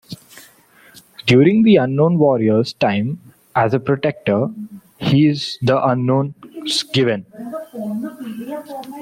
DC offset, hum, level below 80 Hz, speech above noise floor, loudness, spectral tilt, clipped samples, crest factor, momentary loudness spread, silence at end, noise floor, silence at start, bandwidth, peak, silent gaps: under 0.1%; none; -56 dBFS; 33 dB; -17 LUFS; -6.5 dB/octave; under 0.1%; 16 dB; 17 LU; 0 s; -49 dBFS; 0.1 s; 16 kHz; -2 dBFS; none